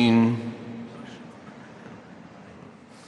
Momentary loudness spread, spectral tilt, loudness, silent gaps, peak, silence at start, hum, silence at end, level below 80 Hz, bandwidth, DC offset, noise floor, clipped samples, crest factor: 24 LU; -7 dB/octave; -25 LUFS; none; -8 dBFS; 0 s; none; 0.4 s; -66 dBFS; 8.8 kHz; under 0.1%; -47 dBFS; under 0.1%; 18 dB